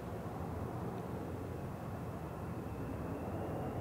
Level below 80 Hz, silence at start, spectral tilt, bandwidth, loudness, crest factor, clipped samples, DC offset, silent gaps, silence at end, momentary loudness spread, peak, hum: -56 dBFS; 0 s; -8 dB/octave; 16 kHz; -43 LUFS; 12 dB; under 0.1%; under 0.1%; none; 0 s; 3 LU; -28 dBFS; none